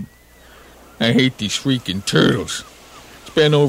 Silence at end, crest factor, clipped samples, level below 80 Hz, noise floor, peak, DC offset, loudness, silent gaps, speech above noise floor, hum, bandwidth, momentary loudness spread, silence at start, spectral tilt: 0 s; 18 dB; under 0.1%; -48 dBFS; -46 dBFS; -2 dBFS; under 0.1%; -18 LUFS; none; 30 dB; none; 16 kHz; 18 LU; 0 s; -5 dB/octave